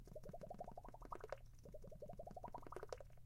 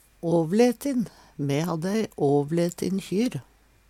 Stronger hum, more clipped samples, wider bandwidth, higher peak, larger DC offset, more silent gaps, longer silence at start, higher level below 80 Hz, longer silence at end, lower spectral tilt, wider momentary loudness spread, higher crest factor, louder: neither; neither; about the same, 16 kHz vs 16.5 kHz; second, -32 dBFS vs -8 dBFS; neither; neither; second, 0 s vs 0.25 s; about the same, -62 dBFS vs -60 dBFS; second, 0 s vs 0.5 s; about the same, -6 dB/octave vs -6.5 dB/octave; second, 5 LU vs 8 LU; first, 24 dB vs 16 dB; second, -56 LUFS vs -25 LUFS